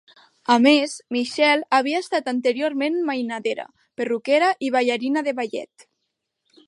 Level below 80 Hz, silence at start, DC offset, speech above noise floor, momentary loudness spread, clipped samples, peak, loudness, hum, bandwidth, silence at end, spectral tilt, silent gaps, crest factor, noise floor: -76 dBFS; 0.5 s; under 0.1%; 57 dB; 12 LU; under 0.1%; -2 dBFS; -21 LUFS; none; 11.5 kHz; 1 s; -3 dB/octave; none; 20 dB; -78 dBFS